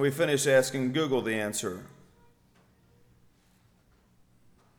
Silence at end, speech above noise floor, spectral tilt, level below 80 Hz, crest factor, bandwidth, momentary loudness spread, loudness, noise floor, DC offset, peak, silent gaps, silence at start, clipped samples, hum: 2.9 s; 37 dB; -4 dB/octave; -68 dBFS; 20 dB; 19.5 kHz; 11 LU; -27 LUFS; -64 dBFS; under 0.1%; -10 dBFS; none; 0 s; under 0.1%; none